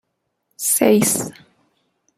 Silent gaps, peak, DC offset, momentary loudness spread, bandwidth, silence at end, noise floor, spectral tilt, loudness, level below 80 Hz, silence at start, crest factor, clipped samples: none; -2 dBFS; under 0.1%; 11 LU; 16 kHz; 0.85 s; -72 dBFS; -3.5 dB/octave; -17 LUFS; -60 dBFS; 0.6 s; 20 dB; under 0.1%